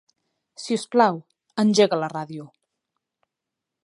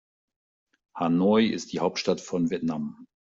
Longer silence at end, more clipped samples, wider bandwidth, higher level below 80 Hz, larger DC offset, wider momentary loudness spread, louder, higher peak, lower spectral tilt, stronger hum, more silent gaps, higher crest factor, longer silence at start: first, 1.35 s vs 0.35 s; neither; first, 11.5 kHz vs 7.8 kHz; second, -76 dBFS vs -66 dBFS; neither; first, 18 LU vs 12 LU; first, -22 LUFS vs -26 LUFS; first, -4 dBFS vs -10 dBFS; about the same, -5 dB/octave vs -6 dB/octave; neither; neither; about the same, 22 dB vs 18 dB; second, 0.6 s vs 0.95 s